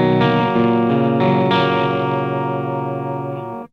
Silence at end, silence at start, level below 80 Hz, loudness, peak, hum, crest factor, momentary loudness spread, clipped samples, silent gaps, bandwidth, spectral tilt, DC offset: 0.05 s; 0 s; -52 dBFS; -18 LUFS; -2 dBFS; none; 14 dB; 9 LU; under 0.1%; none; 6.4 kHz; -8.5 dB/octave; under 0.1%